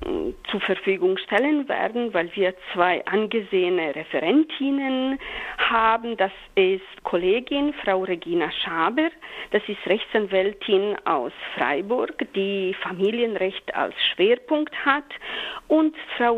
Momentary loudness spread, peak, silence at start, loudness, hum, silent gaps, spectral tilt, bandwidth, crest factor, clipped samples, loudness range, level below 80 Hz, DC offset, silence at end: 6 LU; -4 dBFS; 0 s; -23 LUFS; none; none; -6.5 dB/octave; 5.8 kHz; 20 dB; under 0.1%; 2 LU; -54 dBFS; under 0.1%; 0 s